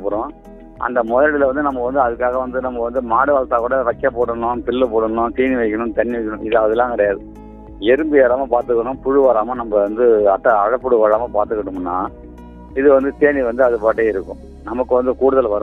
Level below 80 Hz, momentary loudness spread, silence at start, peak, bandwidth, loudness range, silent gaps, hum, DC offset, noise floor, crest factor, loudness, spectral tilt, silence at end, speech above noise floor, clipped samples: -40 dBFS; 9 LU; 0 s; 0 dBFS; 4 kHz; 3 LU; none; none; under 0.1%; -36 dBFS; 16 dB; -17 LUFS; -8.5 dB/octave; 0 s; 20 dB; under 0.1%